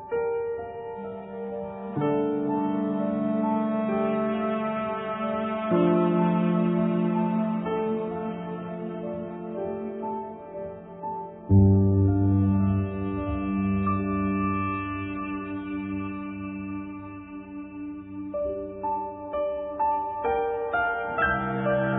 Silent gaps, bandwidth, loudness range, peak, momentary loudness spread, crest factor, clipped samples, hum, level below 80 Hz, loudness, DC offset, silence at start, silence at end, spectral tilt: none; 3.9 kHz; 10 LU; -10 dBFS; 14 LU; 16 dB; under 0.1%; none; -50 dBFS; -27 LUFS; under 0.1%; 0 s; 0 s; -12.5 dB/octave